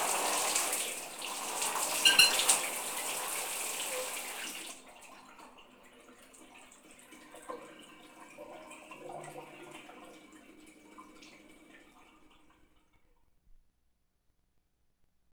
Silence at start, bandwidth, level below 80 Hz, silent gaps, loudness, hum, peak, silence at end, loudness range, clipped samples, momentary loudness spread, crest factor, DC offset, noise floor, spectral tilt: 0 s; over 20 kHz; -72 dBFS; none; -29 LUFS; none; -8 dBFS; 3.6 s; 24 LU; under 0.1%; 28 LU; 28 dB; under 0.1%; -75 dBFS; 1.5 dB/octave